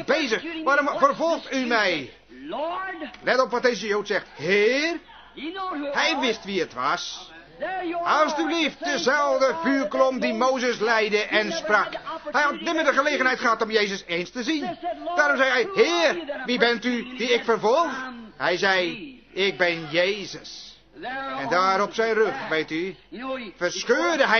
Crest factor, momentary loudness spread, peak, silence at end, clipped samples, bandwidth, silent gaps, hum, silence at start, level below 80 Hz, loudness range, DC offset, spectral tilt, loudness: 20 dB; 12 LU; -4 dBFS; 0 s; under 0.1%; 6.6 kHz; none; none; 0 s; -62 dBFS; 3 LU; under 0.1%; -3 dB/octave; -23 LUFS